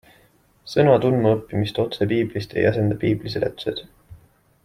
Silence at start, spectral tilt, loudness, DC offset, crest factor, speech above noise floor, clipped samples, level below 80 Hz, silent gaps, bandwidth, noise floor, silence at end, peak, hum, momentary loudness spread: 0.65 s; -7.5 dB/octave; -21 LUFS; under 0.1%; 20 dB; 37 dB; under 0.1%; -52 dBFS; none; 14 kHz; -57 dBFS; 0.5 s; -2 dBFS; none; 9 LU